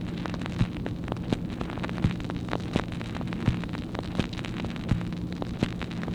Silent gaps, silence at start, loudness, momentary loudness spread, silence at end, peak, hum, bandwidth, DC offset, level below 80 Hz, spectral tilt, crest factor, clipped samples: none; 0 s; -31 LUFS; 4 LU; 0 s; -8 dBFS; none; 11.5 kHz; under 0.1%; -42 dBFS; -7 dB/octave; 22 dB; under 0.1%